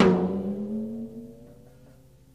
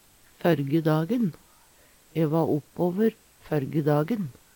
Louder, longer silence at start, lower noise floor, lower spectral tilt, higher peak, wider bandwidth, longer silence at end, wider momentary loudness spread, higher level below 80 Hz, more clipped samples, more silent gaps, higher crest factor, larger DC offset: second, -29 LUFS vs -26 LUFS; second, 0 s vs 0.45 s; about the same, -54 dBFS vs -57 dBFS; about the same, -8 dB/octave vs -8.5 dB/octave; about the same, -6 dBFS vs -8 dBFS; second, 7.6 kHz vs 19 kHz; first, 0.8 s vs 0.25 s; first, 24 LU vs 6 LU; first, -58 dBFS vs -64 dBFS; neither; neither; about the same, 22 dB vs 18 dB; first, 0.1% vs under 0.1%